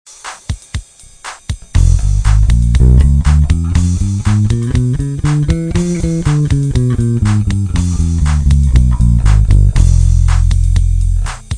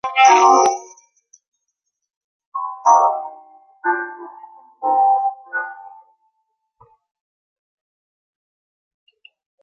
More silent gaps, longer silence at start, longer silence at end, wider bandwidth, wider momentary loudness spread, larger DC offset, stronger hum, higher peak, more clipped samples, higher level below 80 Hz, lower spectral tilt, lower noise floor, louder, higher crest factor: second, none vs 1.48-1.52 s, 2.16-2.40 s, 2.46-2.52 s; first, 0.25 s vs 0.05 s; second, 0 s vs 3.75 s; first, 10 kHz vs 7 kHz; second, 13 LU vs 21 LU; neither; neither; about the same, 0 dBFS vs 0 dBFS; first, 0.1% vs under 0.1%; first, -14 dBFS vs -78 dBFS; first, -7 dB/octave vs -0.5 dB/octave; second, -32 dBFS vs -77 dBFS; first, -13 LUFS vs -16 LUFS; second, 10 dB vs 20 dB